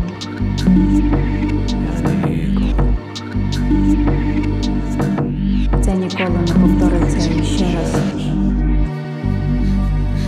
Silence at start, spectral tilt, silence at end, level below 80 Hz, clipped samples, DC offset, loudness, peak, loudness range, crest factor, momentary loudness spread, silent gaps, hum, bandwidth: 0 s; -7 dB/octave; 0 s; -20 dBFS; under 0.1%; under 0.1%; -17 LUFS; -2 dBFS; 2 LU; 14 dB; 7 LU; none; 50 Hz at -30 dBFS; 11 kHz